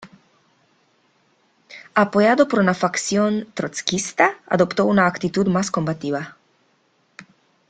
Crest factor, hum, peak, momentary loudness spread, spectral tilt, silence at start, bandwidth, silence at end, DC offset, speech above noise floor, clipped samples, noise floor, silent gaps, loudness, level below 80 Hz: 20 dB; none; -2 dBFS; 10 LU; -5 dB/octave; 0 s; 9.4 kHz; 0.5 s; under 0.1%; 44 dB; under 0.1%; -63 dBFS; none; -20 LUFS; -60 dBFS